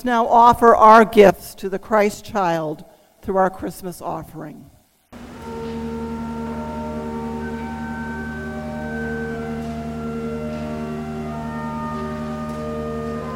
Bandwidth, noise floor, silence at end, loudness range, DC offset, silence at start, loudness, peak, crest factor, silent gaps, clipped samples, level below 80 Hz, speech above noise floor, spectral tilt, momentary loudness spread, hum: 16.5 kHz; -43 dBFS; 0 s; 14 LU; under 0.1%; 0 s; -20 LUFS; 0 dBFS; 20 dB; none; under 0.1%; -42 dBFS; 27 dB; -6 dB/octave; 18 LU; none